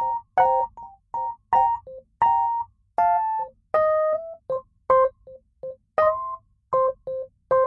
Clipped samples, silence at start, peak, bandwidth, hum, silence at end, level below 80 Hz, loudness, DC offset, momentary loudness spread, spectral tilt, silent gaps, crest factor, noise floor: under 0.1%; 0 s; -8 dBFS; 5.6 kHz; none; 0 s; -58 dBFS; -24 LUFS; under 0.1%; 14 LU; -6.5 dB/octave; none; 16 dB; -49 dBFS